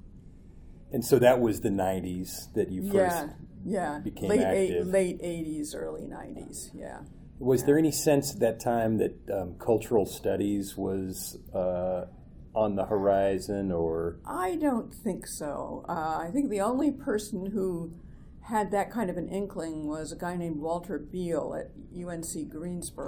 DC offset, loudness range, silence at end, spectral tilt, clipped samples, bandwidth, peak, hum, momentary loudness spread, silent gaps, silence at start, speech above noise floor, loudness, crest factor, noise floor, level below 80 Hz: under 0.1%; 5 LU; 0 s; -5.5 dB/octave; under 0.1%; over 20 kHz; -8 dBFS; none; 13 LU; none; 0.05 s; 20 dB; -29 LUFS; 22 dB; -49 dBFS; -50 dBFS